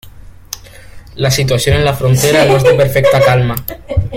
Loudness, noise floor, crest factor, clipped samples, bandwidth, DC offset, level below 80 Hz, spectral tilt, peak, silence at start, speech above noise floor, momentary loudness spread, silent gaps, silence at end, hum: -11 LUFS; -34 dBFS; 12 dB; under 0.1%; 16.5 kHz; under 0.1%; -30 dBFS; -5 dB/octave; 0 dBFS; 0.05 s; 23 dB; 18 LU; none; 0 s; none